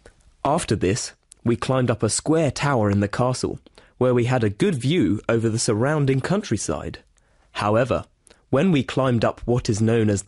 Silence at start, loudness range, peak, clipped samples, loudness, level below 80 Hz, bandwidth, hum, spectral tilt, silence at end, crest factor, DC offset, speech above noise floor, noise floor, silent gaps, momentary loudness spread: 0.45 s; 2 LU; -8 dBFS; under 0.1%; -22 LUFS; -46 dBFS; 11.5 kHz; none; -5.5 dB/octave; 0.05 s; 14 dB; under 0.1%; 38 dB; -59 dBFS; none; 7 LU